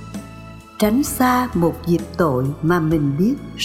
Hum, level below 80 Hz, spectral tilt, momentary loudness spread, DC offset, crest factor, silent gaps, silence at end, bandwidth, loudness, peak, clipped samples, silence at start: none; -40 dBFS; -6 dB/octave; 17 LU; under 0.1%; 16 dB; none; 0 s; 17 kHz; -19 LUFS; -4 dBFS; under 0.1%; 0 s